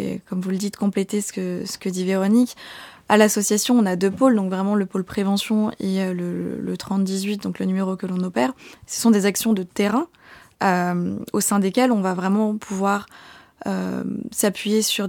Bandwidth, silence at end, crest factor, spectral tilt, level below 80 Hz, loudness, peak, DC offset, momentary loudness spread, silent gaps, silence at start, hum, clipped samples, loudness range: 18.5 kHz; 0 s; 18 dB; -5 dB/octave; -62 dBFS; -21 LUFS; -2 dBFS; under 0.1%; 9 LU; none; 0 s; none; under 0.1%; 4 LU